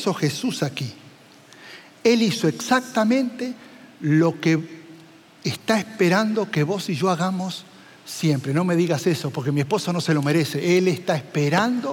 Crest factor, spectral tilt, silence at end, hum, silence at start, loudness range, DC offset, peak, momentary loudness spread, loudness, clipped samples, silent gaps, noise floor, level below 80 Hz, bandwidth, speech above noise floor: 16 dB; -5.5 dB/octave; 0 s; none; 0 s; 2 LU; under 0.1%; -6 dBFS; 12 LU; -22 LUFS; under 0.1%; none; -48 dBFS; -74 dBFS; 17 kHz; 27 dB